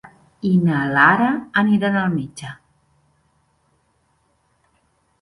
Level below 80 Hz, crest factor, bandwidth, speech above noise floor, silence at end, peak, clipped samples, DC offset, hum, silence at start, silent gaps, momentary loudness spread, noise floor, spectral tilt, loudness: -58 dBFS; 20 dB; 11.5 kHz; 47 dB; 2.7 s; 0 dBFS; under 0.1%; under 0.1%; none; 0.45 s; none; 17 LU; -64 dBFS; -7 dB/octave; -17 LUFS